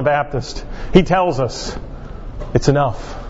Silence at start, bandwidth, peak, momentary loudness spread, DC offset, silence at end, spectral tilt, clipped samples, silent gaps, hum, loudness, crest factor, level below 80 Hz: 0 s; 8 kHz; 0 dBFS; 18 LU; under 0.1%; 0 s; -6 dB/octave; under 0.1%; none; none; -18 LUFS; 18 dB; -30 dBFS